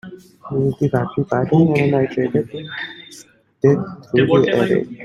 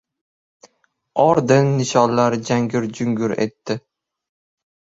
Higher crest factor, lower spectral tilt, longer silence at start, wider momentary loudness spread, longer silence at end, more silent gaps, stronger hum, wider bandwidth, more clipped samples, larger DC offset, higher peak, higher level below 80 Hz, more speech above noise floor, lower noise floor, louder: about the same, 16 dB vs 18 dB; first, -8 dB/octave vs -6 dB/octave; second, 0.05 s vs 1.15 s; about the same, 13 LU vs 12 LU; second, 0 s vs 1.15 s; neither; neither; first, 11.5 kHz vs 7.8 kHz; neither; neither; about the same, -2 dBFS vs -2 dBFS; about the same, -54 dBFS vs -58 dBFS; second, 28 dB vs 44 dB; second, -44 dBFS vs -62 dBFS; about the same, -18 LUFS vs -19 LUFS